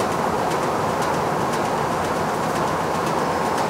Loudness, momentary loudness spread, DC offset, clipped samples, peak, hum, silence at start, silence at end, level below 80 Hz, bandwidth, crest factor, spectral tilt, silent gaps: -22 LUFS; 1 LU; under 0.1%; under 0.1%; -8 dBFS; none; 0 s; 0 s; -50 dBFS; 16 kHz; 14 dB; -5 dB/octave; none